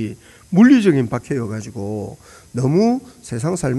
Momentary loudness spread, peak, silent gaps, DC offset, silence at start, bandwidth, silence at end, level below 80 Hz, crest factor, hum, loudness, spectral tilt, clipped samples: 18 LU; -2 dBFS; none; under 0.1%; 0 s; 12 kHz; 0 s; -50 dBFS; 16 dB; none; -17 LUFS; -7 dB/octave; under 0.1%